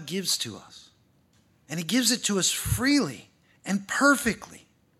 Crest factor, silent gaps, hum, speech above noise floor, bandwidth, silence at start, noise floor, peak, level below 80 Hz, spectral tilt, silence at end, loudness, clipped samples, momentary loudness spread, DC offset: 20 dB; none; none; 38 dB; 15.5 kHz; 0 s; -64 dBFS; -6 dBFS; -50 dBFS; -3 dB/octave; 0.4 s; -25 LUFS; under 0.1%; 17 LU; under 0.1%